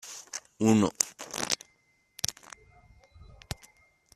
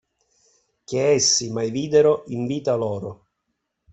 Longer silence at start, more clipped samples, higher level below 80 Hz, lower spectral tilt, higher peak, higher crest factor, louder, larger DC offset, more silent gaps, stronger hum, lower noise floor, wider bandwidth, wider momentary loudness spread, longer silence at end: second, 0.05 s vs 0.9 s; neither; about the same, -60 dBFS vs -60 dBFS; about the same, -4 dB/octave vs -3.5 dB/octave; about the same, -2 dBFS vs -4 dBFS; first, 30 dB vs 18 dB; second, -29 LUFS vs -21 LUFS; neither; neither; neither; second, -69 dBFS vs -77 dBFS; first, 14.5 kHz vs 8.4 kHz; first, 21 LU vs 11 LU; first, 1.85 s vs 0.8 s